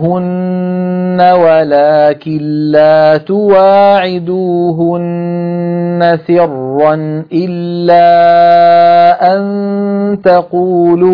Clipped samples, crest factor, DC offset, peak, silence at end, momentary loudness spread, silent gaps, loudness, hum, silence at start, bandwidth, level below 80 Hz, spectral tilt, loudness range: 0.4%; 8 dB; under 0.1%; 0 dBFS; 0 s; 10 LU; none; -9 LUFS; none; 0 s; 5.2 kHz; -54 dBFS; -9.5 dB/octave; 4 LU